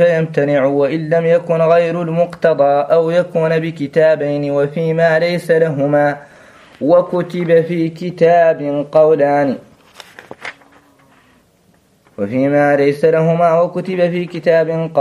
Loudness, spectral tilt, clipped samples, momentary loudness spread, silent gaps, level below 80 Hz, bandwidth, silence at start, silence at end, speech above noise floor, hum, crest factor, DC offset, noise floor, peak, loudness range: -14 LUFS; -8 dB/octave; under 0.1%; 7 LU; none; -60 dBFS; 11.5 kHz; 0 s; 0 s; 40 dB; none; 14 dB; under 0.1%; -53 dBFS; 0 dBFS; 5 LU